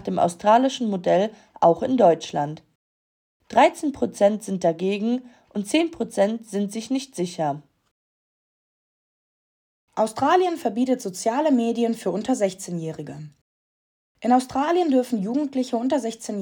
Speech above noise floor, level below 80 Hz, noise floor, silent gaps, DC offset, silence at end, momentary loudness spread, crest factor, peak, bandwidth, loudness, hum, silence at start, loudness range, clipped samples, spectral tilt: over 68 dB; -66 dBFS; under -90 dBFS; 2.75-3.40 s, 7.91-9.88 s, 13.41-14.15 s; under 0.1%; 0 s; 11 LU; 18 dB; -4 dBFS; 18 kHz; -23 LUFS; none; 0 s; 7 LU; under 0.1%; -5.5 dB/octave